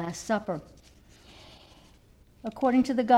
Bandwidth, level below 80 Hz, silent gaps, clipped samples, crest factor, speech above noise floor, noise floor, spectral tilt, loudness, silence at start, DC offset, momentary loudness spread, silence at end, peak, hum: 13 kHz; -58 dBFS; none; under 0.1%; 20 dB; 32 dB; -57 dBFS; -5.5 dB/octave; -29 LUFS; 0 s; under 0.1%; 26 LU; 0 s; -10 dBFS; none